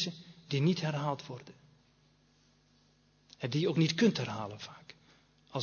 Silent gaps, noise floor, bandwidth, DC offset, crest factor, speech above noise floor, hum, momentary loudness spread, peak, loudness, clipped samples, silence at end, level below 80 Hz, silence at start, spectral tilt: none; -68 dBFS; 7 kHz; under 0.1%; 20 dB; 36 dB; 50 Hz at -60 dBFS; 19 LU; -14 dBFS; -33 LUFS; under 0.1%; 0 s; -74 dBFS; 0 s; -6 dB/octave